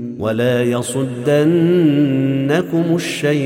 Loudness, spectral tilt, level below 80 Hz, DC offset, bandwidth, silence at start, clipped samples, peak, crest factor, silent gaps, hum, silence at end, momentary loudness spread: -16 LUFS; -6.5 dB/octave; -58 dBFS; under 0.1%; 16.5 kHz; 0 s; under 0.1%; -4 dBFS; 12 dB; none; none; 0 s; 6 LU